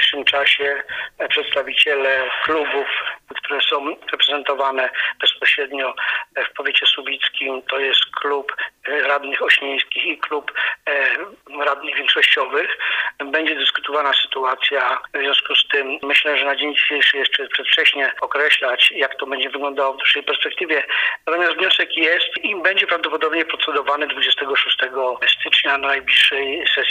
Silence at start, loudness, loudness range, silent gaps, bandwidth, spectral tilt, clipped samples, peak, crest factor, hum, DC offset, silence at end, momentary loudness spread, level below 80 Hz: 0 s; -17 LUFS; 3 LU; none; 15.5 kHz; -1 dB/octave; under 0.1%; 0 dBFS; 18 dB; none; under 0.1%; 0 s; 8 LU; -66 dBFS